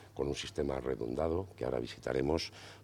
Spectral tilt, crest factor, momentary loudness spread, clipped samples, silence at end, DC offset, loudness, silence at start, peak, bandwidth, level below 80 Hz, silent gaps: -5.5 dB/octave; 18 dB; 4 LU; under 0.1%; 0 s; under 0.1%; -36 LUFS; 0 s; -18 dBFS; 15.5 kHz; -52 dBFS; none